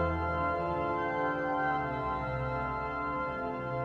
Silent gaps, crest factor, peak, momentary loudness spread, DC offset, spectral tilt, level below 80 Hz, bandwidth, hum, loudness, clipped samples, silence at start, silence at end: none; 12 dB; -20 dBFS; 3 LU; under 0.1%; -8.5 dB/octave; -48 dBFS; 8.2 kHz; none; -33 LUFS; under 0.1%; 0 s; 0 s